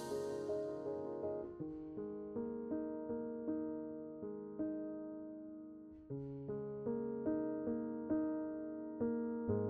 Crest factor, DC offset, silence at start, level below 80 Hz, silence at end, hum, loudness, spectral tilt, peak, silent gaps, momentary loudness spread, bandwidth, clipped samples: 16 dB; under 0.1%; 0 s; -72 dBFS; 0 s; none; -43 LUFS; -8.5 dB/octave; -26 dBFS; none; 9 LU; 12 kHz; under 0.1%